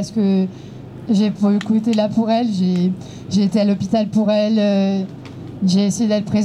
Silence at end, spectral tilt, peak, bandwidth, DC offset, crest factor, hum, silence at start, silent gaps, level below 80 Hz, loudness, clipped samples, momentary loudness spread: 0 s; -7 dB/octave; -6 dBFS; 11 kHz; under 0.1%; 12 dB; none; 0 s; none; -54 dBFS; -18 LUFS; under 0.1%; 13 LU